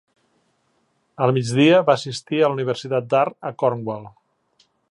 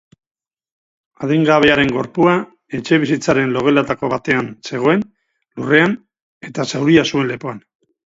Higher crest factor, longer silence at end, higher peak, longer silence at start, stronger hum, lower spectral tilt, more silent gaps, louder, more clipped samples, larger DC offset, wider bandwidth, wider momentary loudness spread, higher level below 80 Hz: about the same, 20 dB vs 18 dB; first, 0.85 s vs 0.6 s; about the same, -2 dBFS vs 0 dBFS; about the same, 1.2 s vs 1.2 s; neither; about the same, -6 dB/octave vs -5.5 dB/octave; second, none vs 6.22-6.41 s; second, -20 LUFS vs -16 LUFS; neither; neither; first, 11.5 kHz vs 7.8 kHz; second, 10 LU vs 15 LU; second, -68 dBFS vs -52 dBFS